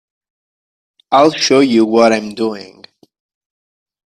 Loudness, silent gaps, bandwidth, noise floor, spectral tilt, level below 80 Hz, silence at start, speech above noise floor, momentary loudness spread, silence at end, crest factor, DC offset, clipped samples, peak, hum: -12 LUFS; none; 11.5 kHz; under -90 dBFS; -4 dB/octave; -60 dBFS; 1.1 s; over 78 dB; 10 LU; 1.45 s; 16 dB; under 0.1%; under 0.1%; 0 dBFS; none